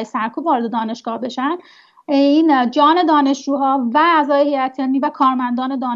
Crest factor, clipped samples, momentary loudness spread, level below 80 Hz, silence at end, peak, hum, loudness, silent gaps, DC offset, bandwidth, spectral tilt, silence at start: 14 dB; under 0.1%; 9 LU; -74 dBFS; 0 s; -2 dBFS; none; -16 LUFS; none; under 0.1%; 7.6 kHz; -4.5 dB/octave; 0 s